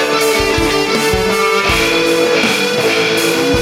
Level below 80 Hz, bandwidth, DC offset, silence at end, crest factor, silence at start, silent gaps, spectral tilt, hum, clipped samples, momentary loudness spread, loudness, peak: -32 dBFS; 16.5 kHz; under 0.1%; 0 s; 12 dB; 0 s; none; -3 dB/octave; none; under 0.1%; 2 LU; -12 LUFS; -2 dBFS